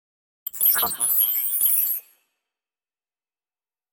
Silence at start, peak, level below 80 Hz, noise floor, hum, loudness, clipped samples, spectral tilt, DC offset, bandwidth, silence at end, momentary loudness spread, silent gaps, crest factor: 0.45 s; -6 dBFS; -68 dBFS; under -90 dBFS; none; -19 LUFS; under 0.1%; 1.5 dB/octave; under 0.1%; 17 kHz; 1.9 s; 12 LU; none; 18 dB